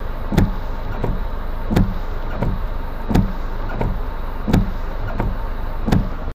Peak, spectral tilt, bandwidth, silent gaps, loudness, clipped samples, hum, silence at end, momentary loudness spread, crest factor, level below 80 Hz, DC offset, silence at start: 0 dBFS; -7.5 dB/octave; 16 kHz; none; -23 LUFS; under 0.1%; none; 0 s; 9 LU; 18 dB; -22 dBFS; under 0.1%; 0 s